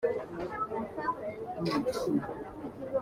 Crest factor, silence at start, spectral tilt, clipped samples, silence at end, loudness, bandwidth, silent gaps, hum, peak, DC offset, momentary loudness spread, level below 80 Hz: 16 dB; 0 s; -6.5 dB/octave; under 0.1%; 0 s; -35 LUFS; 16 kHz; none; none; -18 dBFS; under 0.1%; 9 LU; -60 dBFS